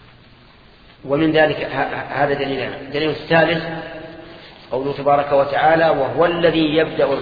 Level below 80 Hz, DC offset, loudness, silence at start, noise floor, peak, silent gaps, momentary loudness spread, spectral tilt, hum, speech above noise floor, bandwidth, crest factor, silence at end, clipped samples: -48 dBFS; under 0.1%; -18 LUFS; 1.05 s; -47 dBFS; 0 dBFS; none; 15 LU; -8 dB/octave; none; 29 dB; 5 kHz; 18 dB; 0 s; under 0.1%